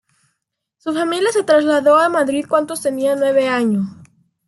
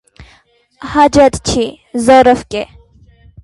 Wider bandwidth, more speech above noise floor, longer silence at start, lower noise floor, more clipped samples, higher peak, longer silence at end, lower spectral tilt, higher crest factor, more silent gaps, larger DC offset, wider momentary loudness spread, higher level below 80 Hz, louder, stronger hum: about the same, 12.5 kHz vs 11.5 kHz; first, 59 dB vs 40 dB; first, 0.85 s vs 0.2 s; first, -75 dBFS vs -51 dBFS; neither; about the same, -2 dBFS vs 0 dBFS; second, 0.55 s vs 0.8 s; about the same, -4.5 dB/octave vs -4.5 dB/octave; about the same, 16 dB vs 14 dB; neither; neither; second, 9 LU vs 15 LU; second, -66 dBFS vs -36 dBFS; second, -16 LUFS vs -11 LUFS; neither